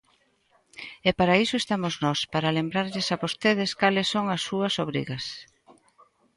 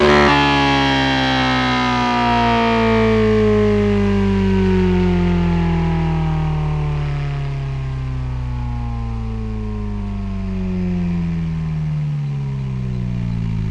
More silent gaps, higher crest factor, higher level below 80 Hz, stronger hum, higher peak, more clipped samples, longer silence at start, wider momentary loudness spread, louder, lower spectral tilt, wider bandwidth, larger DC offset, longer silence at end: neither; first, 22 dB vs 16 dB; second, -60 dBFS vs -28 dBFS; neither; second, -6 dBFS vs 0 dBFS; neither; first, 0.75 s vs 0 s; about the same, 11 LU vs 10 LU; second, -25 LUFS vs -18 LUFS; second, -4.5 dB/octave vs -7 dB/octave; first, 11.5 kHz vs 9.6 kHz; neither; first, 0.95 s vs 0 s